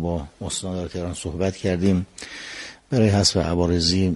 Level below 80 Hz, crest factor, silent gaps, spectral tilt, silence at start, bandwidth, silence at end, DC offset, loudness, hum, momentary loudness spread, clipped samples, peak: -40 dBFS; 18 dB; none; -5 dB/octave; 0 s; 11.5 kHz; 0 s; under 0.1%; -22 LUFS; none; 15 LU; under 0.1%; -4 dBFS